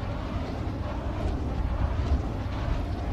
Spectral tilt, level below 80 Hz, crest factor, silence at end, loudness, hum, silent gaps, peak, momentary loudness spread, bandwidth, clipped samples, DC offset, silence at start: -8 dB/octave; -32 dBFS; 14 dB; 0 s; -31 LUFS; none; none; -14 dBFS; 4 LU; 8 kHz; under 0.1%; under 0.1%; 0 s